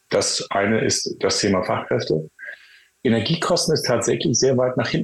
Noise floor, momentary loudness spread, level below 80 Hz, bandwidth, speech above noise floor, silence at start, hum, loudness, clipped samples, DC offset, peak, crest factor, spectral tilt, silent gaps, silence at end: -51 dBFS; 7 LU; -54 dBFS; 12.5 kHz; 31 dB; 0.1 s; none; -20 LUFS; under 0.1%; under 0.1%; -8 dBFS; 14 dB; -4 dB/octave; none; 0 s